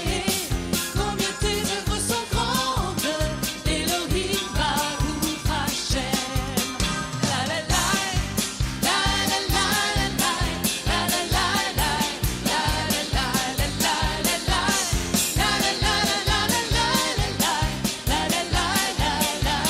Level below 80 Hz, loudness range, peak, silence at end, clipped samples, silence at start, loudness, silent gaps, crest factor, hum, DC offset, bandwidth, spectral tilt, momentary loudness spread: -32 dBFS; 3 LU; -8 dBFS; 0 s; under 0.1%; 0 s; -23 LUFS; none; 16 dB; none; under 0.1%; 16 kHz; -3 dB/octave; 4 LU